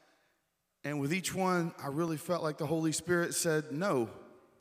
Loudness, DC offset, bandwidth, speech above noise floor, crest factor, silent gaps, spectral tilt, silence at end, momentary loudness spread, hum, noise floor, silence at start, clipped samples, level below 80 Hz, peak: -33 LUFS; under 0.1%; 16 kHz; 47 dB; 18 dB; none; -4.5 dB/octave; 0.3 s; 6 LU; none; -80 dBFS; 0.85 s; under 0.1%; -74 dBFS; -16 dBFS